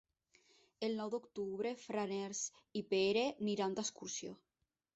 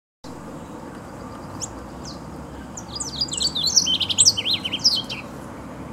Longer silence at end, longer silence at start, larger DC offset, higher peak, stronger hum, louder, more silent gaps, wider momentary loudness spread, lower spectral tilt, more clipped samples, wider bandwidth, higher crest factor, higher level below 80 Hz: first, 0.6 s vs 0 s; first, 0.8 s vs 0.25 s; neither; second, -24 dBFS vs -2 dBFS; neither; second, -40 LUFS vs -19 LUFS; neither; second, 10 LU vs 22 LU; first, -3.5 dB/octave vs -1 dB/octave; neither; second, 8.2 kHz vs 16 kHz; second, 16 dB vs 24 dB; second, -80 dBFS vs -48 dBFS